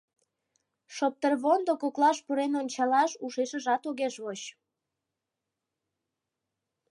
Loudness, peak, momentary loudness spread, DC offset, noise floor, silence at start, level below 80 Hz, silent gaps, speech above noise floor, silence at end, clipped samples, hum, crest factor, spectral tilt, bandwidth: -28 LUFS; -12 dBFS; 12 LU; under 0.1%; -87 dBFS; 0.9 s; -88 dBFS; none; 59 dB; 2.4 s; under 0.1%; none; 20 dB; -3 dB/octave; 11 kHz